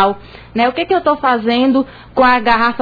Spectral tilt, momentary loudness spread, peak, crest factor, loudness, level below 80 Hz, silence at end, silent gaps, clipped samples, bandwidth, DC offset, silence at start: -6.5 dB/octave; 8 LU; -2 dBFS; 12 dB; -14 LUFS; -40 dBFS; 0 s; none; under 0.1%; 5 kHz; under 0.1%; 0 s